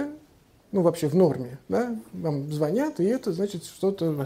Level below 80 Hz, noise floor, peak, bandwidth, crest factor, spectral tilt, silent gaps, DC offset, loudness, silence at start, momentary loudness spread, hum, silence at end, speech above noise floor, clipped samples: -62 dBFS; -57 dBFS; -8 dBFS; 16 kHz; 18 dB; -7.5 dB/octave; none; under 0.1%; -26 LUFS; 0 s; 9 LU; none; 0 s; 32 dB; under 0.1%